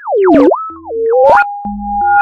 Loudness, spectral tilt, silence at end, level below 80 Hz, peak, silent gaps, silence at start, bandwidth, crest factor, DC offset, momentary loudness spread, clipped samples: -10 LUFS; -7.5 dB/octave; 0 s; -38 dBFS; 0 dBFS; none; 0 s; 7.6 kHz; 10 dB; under 0.1%; 11 LU; 0.4%